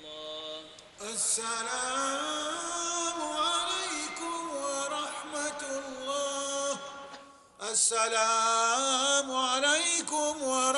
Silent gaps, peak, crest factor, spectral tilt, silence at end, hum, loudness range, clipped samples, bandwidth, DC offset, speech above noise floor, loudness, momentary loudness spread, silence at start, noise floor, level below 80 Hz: none; -12 dBFS; 18 dB; 0.5 dB/octave; 0 s; none; 7 LU; under 0.1%; 11.5 kHz; under 0.1%; 23 dB; -29 LUFS; 14 LU; 0 s; -51 dBFS; -72 dBFS